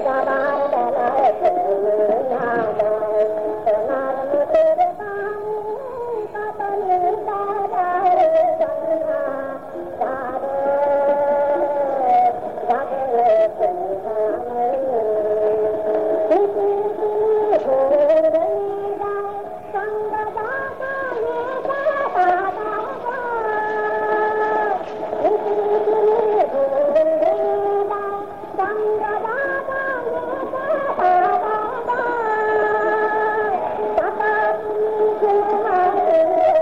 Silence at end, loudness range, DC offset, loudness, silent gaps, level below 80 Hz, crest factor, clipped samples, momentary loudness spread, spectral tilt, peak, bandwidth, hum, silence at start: 0 s; 4 LU; 0.5%; -20 LUFS; none; -58 dBFS; 14 dB; under 0.1%; 9 LU; -6.5 dB/octave; -6 dBFS; 7 kHz; none; 0 s